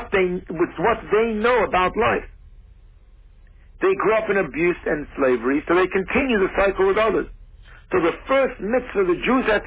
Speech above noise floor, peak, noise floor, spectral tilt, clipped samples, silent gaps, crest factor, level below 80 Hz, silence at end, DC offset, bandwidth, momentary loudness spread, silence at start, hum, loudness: 28 dB; -8 dBFS; -48 dBFS; -9.5 dB/octave; under 0.1%; none; 14 dB; -42 dBFS; 0 s; under 0.1%; 4 kHz; 6 LU; 0 s; none; -20 LUFS